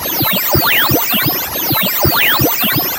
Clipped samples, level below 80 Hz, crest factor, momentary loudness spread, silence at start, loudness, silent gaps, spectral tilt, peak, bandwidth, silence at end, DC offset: under 0.1%; -36 dBFS; 14 dB; 4 LU; 0 s; -11 LUFS; none; -3 dB/octave; 0 dBFS; 16.5 kHz; 0 s; under 0.1%